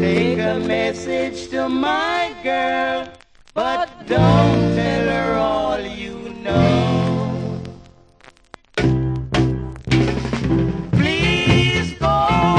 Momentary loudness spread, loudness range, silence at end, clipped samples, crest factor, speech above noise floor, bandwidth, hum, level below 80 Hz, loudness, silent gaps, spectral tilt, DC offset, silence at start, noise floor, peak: 11 LU; 4 LU; 0 s; under 0.1%; 18 dB; 31 dB; 10 kHz; none; -34 dBFS; -19 LUFS; none; -6.5 dB/octave; under 0.1%; 0 s; -49 dBFS; -2 dBFS